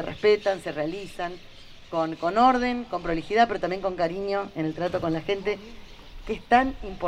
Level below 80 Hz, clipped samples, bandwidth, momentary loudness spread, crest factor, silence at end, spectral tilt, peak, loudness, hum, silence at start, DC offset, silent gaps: -46 dBFS; under 0.1%; 11.5 kHz; 14 LU; 22 dB; 0 s; -6 dB/octave; -4 dBFS; -26 LUFS; none; 0 s; under 0.1%; none